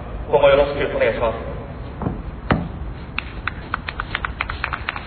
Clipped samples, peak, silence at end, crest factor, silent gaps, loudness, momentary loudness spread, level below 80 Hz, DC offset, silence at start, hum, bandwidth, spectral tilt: under 0.1%; -2 dBFS; 0 s; 20 dB; none; -22 LUFS; 15 LU; -34 dBFS; under 0.1%; 0 s; none; 4.5 kHz; -10 dB/octave